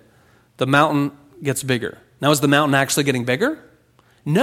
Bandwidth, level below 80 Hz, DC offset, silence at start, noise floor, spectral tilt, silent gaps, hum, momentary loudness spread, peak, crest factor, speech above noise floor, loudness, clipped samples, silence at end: 16.5 kHz; -58 dBFS; under 0.1%; 0.6 s; -56 dBFS; -4.5 dB/octave; none; none; 12 LU; 0 dBFS; 20 dB; 38 dB; -19 LUFS; under 0.1%; 0 s